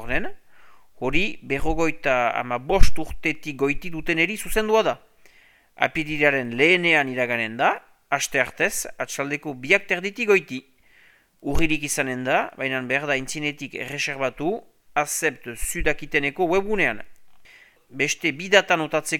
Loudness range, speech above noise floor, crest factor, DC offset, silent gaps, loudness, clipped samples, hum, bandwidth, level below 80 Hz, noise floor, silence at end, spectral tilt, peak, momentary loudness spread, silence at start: 4 LU; 35 dB; 22 dB; under 0.1%; none; -23 LUFS; under 0.1%; none; 16 kHz; -34 dBFS; -56 dBFS; 0 s; -3.5 dB/octave; 0 dBFS; 9 LU; 0 s